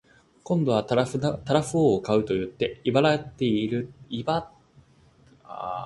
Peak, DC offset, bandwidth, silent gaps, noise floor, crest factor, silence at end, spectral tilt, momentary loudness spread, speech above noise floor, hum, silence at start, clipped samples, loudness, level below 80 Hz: -4 dBFS; under 0.1%; 11.5 kHz; none; -57 dBFS; 20 dB; 0 s; -6.5 dB/octave; 10 LU; 33 dB; none; 0.45 s; under 0.1%; -25 LUFS; -56 dBFS